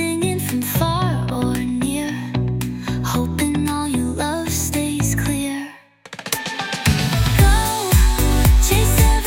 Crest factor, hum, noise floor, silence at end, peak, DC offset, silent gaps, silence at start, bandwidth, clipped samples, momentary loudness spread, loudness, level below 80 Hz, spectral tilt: 18 dB; none; -40 dBFS; 0 s; 0 dBFS; under 0.1%; none; 0 s; 17.5 kHz; under 0.1%; 9 LU; -19 LUFS; -22 dBFS; -4.5 dB/octave